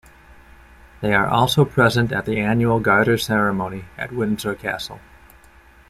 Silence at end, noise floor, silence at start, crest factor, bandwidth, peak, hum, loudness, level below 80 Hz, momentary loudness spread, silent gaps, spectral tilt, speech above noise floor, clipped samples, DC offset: 0.9 s; -49 dBFS; 1 s; 18 dB; 16 kHz; -2 dBFS; none; -19 LUFS; -46 dBFS; 13 LU; none; -6 dB/octave; 30 dB; under 0.1%; under 0.1%